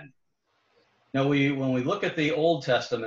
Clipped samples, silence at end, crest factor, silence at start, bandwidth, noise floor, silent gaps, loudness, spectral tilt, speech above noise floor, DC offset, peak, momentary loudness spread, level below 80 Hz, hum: under 0.1%; 0 s; 16 dB; 0 s; 7.6 kHz; -73 dBFS; none; -26 LUFS; -6.5 dB/octave; 48 dB; under 0.1%; -12 dBFS; 4 LU; -66 dBFS; none